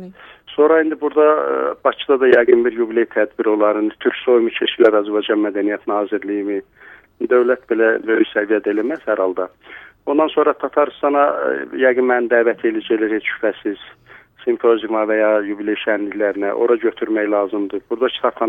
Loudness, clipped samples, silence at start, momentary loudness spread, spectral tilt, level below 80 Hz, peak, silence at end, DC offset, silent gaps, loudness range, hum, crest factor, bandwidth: -17 LUFS; under 0.1%; 0 s; 8 LU; -7 dB/octave; -62 dBFS; 0 dBFS; 0 s; under 0.1%; none; 3 LU; none; 18 dB; 3.9 kHz